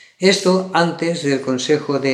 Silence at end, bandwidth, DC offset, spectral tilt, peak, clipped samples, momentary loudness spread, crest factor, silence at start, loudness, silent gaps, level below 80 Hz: 0 s; 12.5 kHz; under 0.1%; -4.5 dB/octave; 0 dBFS; under 0.1%; 5 LU; 16 dB; 0.2 s; -17 LUFS; none; -74 dBFS